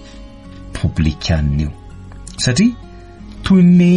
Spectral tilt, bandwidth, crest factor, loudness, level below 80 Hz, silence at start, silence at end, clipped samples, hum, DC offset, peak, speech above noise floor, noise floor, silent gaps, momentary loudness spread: -6 dB/octave; 10.5 kHz; 14 dB; -15 LUFS; -28 dBFS; 0 s; 0 s; under 0.1%; none; under 0.1%; -2 dBFS; 23 dB; -35 dBFS; none; 26 LU